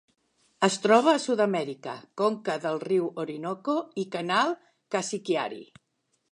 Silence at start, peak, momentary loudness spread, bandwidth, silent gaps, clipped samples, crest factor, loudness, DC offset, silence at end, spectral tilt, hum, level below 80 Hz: 0.6 s; -6 dBFS; 14 LU; 11 kHz; none; under 0.1%; 22 dB; -27 LUFS; under 0.1%; 0.7 s; -4 dB/octave; none; -80 dBFS